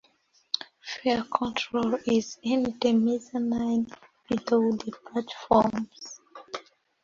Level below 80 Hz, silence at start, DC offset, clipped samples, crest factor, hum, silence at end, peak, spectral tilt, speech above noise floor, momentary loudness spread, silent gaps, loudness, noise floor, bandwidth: -60 dBFS; 0.55 s; under 0.1%; under 0.1%; 22 dB; none; 0.45 s; -6 dBFS; -5 dB/octave; 39 dB; 16 LU; none; -27 LUFS; -65 dBFS; 7.4 kHz